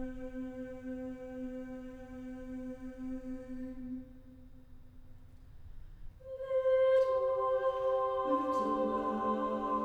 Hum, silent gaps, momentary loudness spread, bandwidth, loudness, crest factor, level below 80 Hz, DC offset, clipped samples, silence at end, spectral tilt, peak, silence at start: none; none; 17 LU; 7.8 kHz; -35 LUFS; 16 dB; -54 dBFS; under 0.1%; under 0.1%; 0 s; -7 dB/octave; -20 dBFS; 0 s